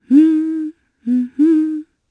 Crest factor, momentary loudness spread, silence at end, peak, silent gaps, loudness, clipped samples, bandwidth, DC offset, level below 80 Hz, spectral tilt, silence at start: 14 dB; 17 LU; 0.3 s; -2 dBFS; none; -16 LUFS; under 0.1%; 3.7 kHz; under 0.1%; -70 dBFS; -7.5 dB/octave; 0.1 s